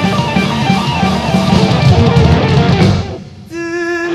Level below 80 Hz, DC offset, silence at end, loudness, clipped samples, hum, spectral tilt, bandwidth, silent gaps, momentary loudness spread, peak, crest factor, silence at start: -26 dBFS; under 0.1%; 0 s; -11 LUFS; under 0.1%; none; -6.5 dB/octave; 13 kHz; none; 12 LU; 0 dBFS; 12 dB; 0 s